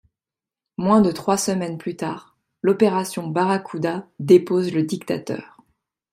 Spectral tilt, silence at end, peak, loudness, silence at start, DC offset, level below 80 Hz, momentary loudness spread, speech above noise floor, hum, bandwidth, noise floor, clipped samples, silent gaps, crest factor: -6 dB/octave; 0.65 s; -2 dBFS; -21 LUFS; 0.8 s; under 0.1%; -60 dBFS; 13 LU; 70 dB; none; 15.5 kHz; -90 dBFS; under 0.1%; none; 18 dB